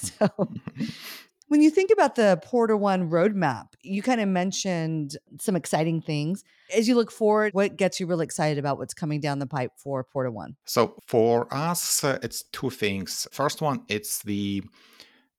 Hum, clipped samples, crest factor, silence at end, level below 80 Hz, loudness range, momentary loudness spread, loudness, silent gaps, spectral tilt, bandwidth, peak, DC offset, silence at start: none; under 0.1%; 20 dB; 0.7 s; -70 dBFS; 5 LU; 12 LU; -25 LUFS; none; -5 dB/octave; 18 kHz; -6 dBFS; under 0.1%; 0 s